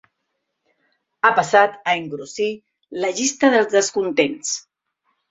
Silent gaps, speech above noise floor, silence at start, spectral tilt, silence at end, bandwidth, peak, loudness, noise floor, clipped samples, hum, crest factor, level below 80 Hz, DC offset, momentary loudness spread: none; 57 dB; 1.25 s; -2.5 dB/octave; 0.7 s; 8.2 kHz; -2 dBFS; -19 LUFS; -76 dBFS; under 0.1%; none; 20 dB; -68 dBFS; under 0.1%; 12 LU